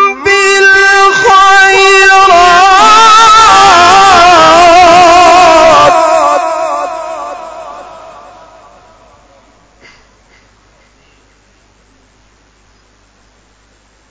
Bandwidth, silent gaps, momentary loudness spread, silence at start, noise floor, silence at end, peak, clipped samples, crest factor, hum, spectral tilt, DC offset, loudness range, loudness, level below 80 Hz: 8 kHz; none; 15 LU; 0 s; -47 dBFS; 6.3 s; 0 dBFS; 7%; 6 dB; none; -1.5 dB/octave; under 0.1%; 15 LU; -3 LUFS; -36 dBFS